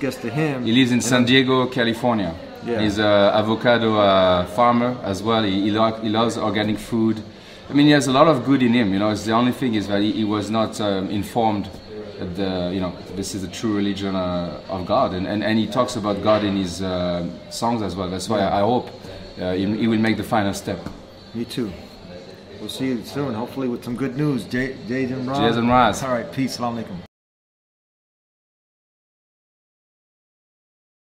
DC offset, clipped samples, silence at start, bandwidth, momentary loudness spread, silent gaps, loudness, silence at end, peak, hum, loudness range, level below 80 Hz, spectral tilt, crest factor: under 0.1%; under 0.1%; 0 s; 16 kHz; 15 LU; none; -20 LUFS; 4.05 s; -2 dBFS; none; 8 LU; -50 dBFS; -5.5 dB/octave; 20 dB